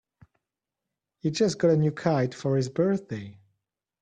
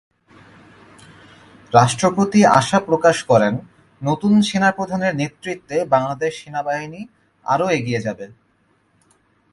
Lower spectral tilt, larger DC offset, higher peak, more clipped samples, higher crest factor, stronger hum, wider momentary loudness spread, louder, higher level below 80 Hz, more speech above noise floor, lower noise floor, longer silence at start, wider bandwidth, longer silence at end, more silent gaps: about the same, -6.5 dB/octave vs -5.5 dB/octave; neither; second, -8 dBFS vs 0 dBFS; neither; about the same, 18 dB vs 20 dB; neither; about the same, 14 LU vs 15 LU; second, -26 LUFS vs -18 LUFS; second, -66 dBFS vs -56 dBFS; first, 62 dB vs 44 dB; first, -87 dBFS vs -61 dBFS; second, 1.25 s vs 1.7 s; second, 9.6 kHz vs 11.5 kHz; second, 0.7 s vs 1.25 s; neither